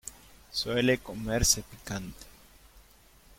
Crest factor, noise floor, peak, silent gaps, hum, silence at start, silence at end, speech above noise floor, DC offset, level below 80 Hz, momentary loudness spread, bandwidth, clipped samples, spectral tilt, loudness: 24 dB; -58 dBFS; -8 dBFS; none; none; 0.05 s; 0.55 s; 28 dB; under 0.1%; -46 dBFS; 20 LU; 16.5 kHz; under 0.1%; -3 dB/octave; -29 LUFS